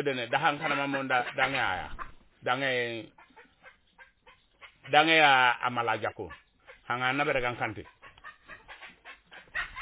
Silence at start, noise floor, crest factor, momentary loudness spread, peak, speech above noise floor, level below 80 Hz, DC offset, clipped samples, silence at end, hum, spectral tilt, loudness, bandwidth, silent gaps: 0 s; -61 dBFS; 26 dB; 25 LU; -4 dBFS; 34 dB; -58 dBFS; under 0.1%; under 0.1%; 0 s; none; -1 dB/octave; -27 LUFS; 4 kHz; none